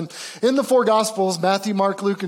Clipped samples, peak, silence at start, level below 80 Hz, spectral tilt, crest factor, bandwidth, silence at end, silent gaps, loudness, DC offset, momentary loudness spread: under 0.1%; -6 dBFS; 0 s; -74 dBFS; -4.5 dB/octave; 12 dB; 17 kHz; 0 s; none; -19 LUFS; under 0.1%; 5 LU